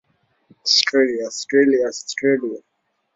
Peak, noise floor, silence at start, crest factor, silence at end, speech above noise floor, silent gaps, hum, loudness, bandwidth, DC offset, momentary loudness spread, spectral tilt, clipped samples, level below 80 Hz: -2 dBFS; -57 dBFS; 0.65 s; 18 dB; 0.55 s; 39 dB; none; none; -18 LUFS; 7.8 kHz; under 0.1%; 11 LU; -2.5 dB/octave; under 0.1%; -68 dBFS